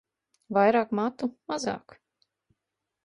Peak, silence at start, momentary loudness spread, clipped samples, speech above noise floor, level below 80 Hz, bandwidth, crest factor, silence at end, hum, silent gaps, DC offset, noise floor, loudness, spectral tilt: -10 dBFS; 0.5 s; 12 LU; under 0.1%; 59 dB; -72 dBFS; 11 kHz; 20 dB; 1.25 s; none; none; under 0.1%; -85 dBFS; -27 LUFS; -5.5 dB/octave